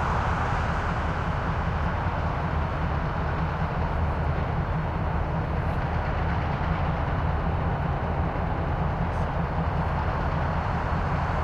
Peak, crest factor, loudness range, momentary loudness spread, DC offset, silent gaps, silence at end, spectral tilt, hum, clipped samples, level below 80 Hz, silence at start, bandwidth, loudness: -14 dBFS; 12 dB; 0 LU; 1 LU; under 0.1%; none; 0 s; -8 dB/octave; none; under 0.1%; -32 dBFS; 0 s; 7.4 kHz; -27 LUFS